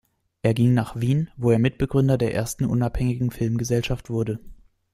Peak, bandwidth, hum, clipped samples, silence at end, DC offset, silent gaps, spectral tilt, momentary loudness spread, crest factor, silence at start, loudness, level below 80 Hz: -6 dBFS; 14.5 kHz; none; under 0.1%; 0.4 s; under 0.1%; none; -7 dB/octave; 6 LU; 18 dB; 0.45 s; -23 LUFS; -42 dBFS